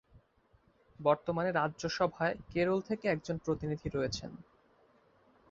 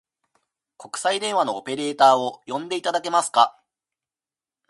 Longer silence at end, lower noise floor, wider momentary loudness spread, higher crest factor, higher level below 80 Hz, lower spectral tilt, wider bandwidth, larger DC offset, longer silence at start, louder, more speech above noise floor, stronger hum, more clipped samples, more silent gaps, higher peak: about the same, 1.1 s vs 1.2 s; second, -69 dBFS vs under -90 dBFS; second, 5 LU vs 11 LU; about the same, 20 dB vs 22 dB; first, -60 dBFS vs -78 dBFS; first, -6 dB/octave vs -2.5 dB/octave; second, 7.8 kHz vs 11.5 kHz; neither; first, 1 s vs 0.8 s; second, -34 LUFS vs -22 LUFS; second, 35 dB vs over 69 dB; neither; neither; neither; second, -14 dBFS vs -2 dBFS